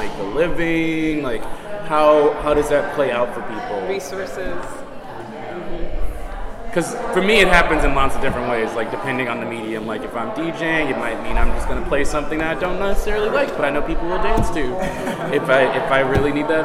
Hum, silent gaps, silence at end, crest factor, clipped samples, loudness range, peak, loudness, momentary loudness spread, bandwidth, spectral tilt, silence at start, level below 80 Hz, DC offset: none; none; 0 s; 18 dB; under 0.1%; 7 LU; 0 dBFS; -20 LUFS; 14 LU; 14 kHz; -5 dB/octave; 0 s; -28 dBFS; under 0.1%